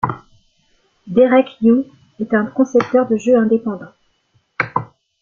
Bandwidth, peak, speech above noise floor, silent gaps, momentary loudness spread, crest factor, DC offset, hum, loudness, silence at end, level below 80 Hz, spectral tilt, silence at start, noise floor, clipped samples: 7.4 kHz; -2 dBFS; 47 dB; none; 16 LU; 16 dB; under 0.1%; none; -16 LUFS; 0.35 s; -56 dBFS; -7 dB/octave; 0.05 s; -62 dBFS; under 0.1%